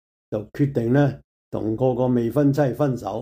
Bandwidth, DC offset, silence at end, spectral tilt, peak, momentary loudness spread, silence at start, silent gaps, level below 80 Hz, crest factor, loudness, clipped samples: 15.5 kHz; under 0.1%; 0 s; -9 dB/octave; -8 dBFS; 12 LU; 0.3 s; 1.24-1.52 s; -52 dBFS; 14 dB; -22 LUFS; under 0.1%